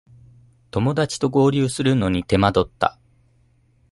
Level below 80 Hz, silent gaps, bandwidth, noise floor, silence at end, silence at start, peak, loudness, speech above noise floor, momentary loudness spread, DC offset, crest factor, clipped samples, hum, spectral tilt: -42 dBFS; none; 11.5 kHz; -59 dBFS; 1 s; 0.75 s; -2 dBFS; -20 LUFS; 40 dB; 6 LU; under 0.1%; 20 dB; under 0.1%; none; -6 dB/octave